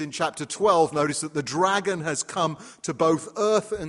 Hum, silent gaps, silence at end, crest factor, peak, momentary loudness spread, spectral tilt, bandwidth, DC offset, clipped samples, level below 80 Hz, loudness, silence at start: none; none; 0 s; 18 dB; -6 dBFS; 7 LU; -4 dB/octave; 11.5 kHz; under 0.1%; under 0.1%; -60 dBFS; -24 LUFS; 0 s